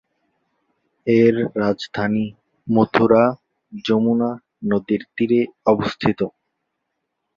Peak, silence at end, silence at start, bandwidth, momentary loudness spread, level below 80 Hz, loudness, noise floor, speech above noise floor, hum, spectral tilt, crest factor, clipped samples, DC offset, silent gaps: -2 dBFS; 1.05 s; 1.05 s; 7.2 kHz; 13 LU; -56 dBFS; -19 LUFS; -76 dBFS; 58 dB; none; -7.5 dB/octave; 18 dB; under 0.1%; under 0.1%; none